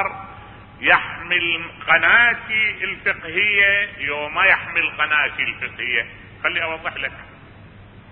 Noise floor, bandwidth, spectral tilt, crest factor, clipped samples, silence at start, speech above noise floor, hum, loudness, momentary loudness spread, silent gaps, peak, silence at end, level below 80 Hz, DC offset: -43 dBFS; 4.8 kHz; -7.5 dB/octave; 20 dB; under 0.1%; 0 s; 23 dB; none; -18 LUFS; 12 LU; none; 0 dBFS; 0 s; -50 dBFS; under 0.1%